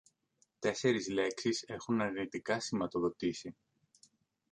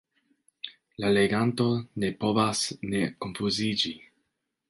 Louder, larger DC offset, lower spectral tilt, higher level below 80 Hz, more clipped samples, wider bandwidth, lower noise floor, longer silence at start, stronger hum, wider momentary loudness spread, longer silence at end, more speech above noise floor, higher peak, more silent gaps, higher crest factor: second, -35 LUFS vs -27 LUFS; neither; about the same, -4.5 dB/octave vs -4.5 dB/octave; second, -70 dBFS vs -60 dBFS; neither; about the same, 10.5 kHz vs 11.5 kHz; about the same, -76 dBFS vs -79 dBFS; about the same, 0.6 s vs 0.65 s; neither; second, 6 LU vs 17 LU; first, 1 s vs 0.7 s; second, 41 dB vs 53 dB; second, -16 dBFS vs -10 dBFS; neither; about the same, 20 dB vs 20 dB